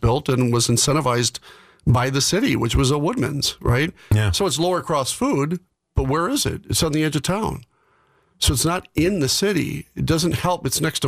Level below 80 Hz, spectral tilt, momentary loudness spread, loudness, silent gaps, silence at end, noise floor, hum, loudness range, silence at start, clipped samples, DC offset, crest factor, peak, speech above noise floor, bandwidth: -36 dBFS; -4.5 dB/octave; 7 LU; -20 LUFS; none; 0 s; -61 dBFS; none; 3 LU; 0 s; under 0.1%; under 0.1%; 14 dB; -8 dBFS; 40 dB; 16 kHz